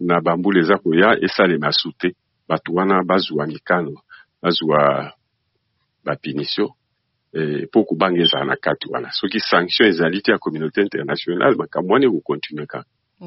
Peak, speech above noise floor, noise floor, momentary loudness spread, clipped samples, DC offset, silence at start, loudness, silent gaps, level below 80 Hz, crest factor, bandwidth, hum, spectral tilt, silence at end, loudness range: -2 dBFS; 53 dB; -71 dBFS; 10 LU; under 0.1%; under 0.1%; 0 s; -18 LUFS; none; -62 dBFS; 18 dB; 6 kHz; none; -3 dB/octave; 0 s; 5 LU